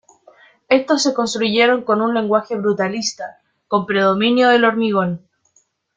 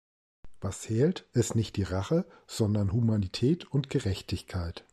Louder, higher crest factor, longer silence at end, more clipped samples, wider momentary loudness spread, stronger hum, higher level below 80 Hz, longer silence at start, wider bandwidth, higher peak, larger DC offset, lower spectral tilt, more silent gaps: first, -17 LUFS vs -30 LUFS; about the same, 16 dB vs 16 dB; first, 0.8 s vs 0.15 s; neither; about the same, 10 LU vs 9 LU; neither; second, -62 dBFS vs -52 dBFS; first, 0.7 s vs 0.45 s; second, 9.4 kHz vs 14 kHz; first, -2 dBFS vs -14 dBFS; neither; second, -4 dB/octave vs -6.5 dB/octave; neither